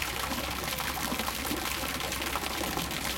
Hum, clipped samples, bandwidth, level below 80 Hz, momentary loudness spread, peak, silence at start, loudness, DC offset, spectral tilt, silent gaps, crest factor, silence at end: none; under 0.1%; 17 kHz; -46 dBFS; 1 LU; -12 dBFS; 0 s; -31 LUFS; under 0.1%; -2.5 dB/octave; none; 20 dB; 0 s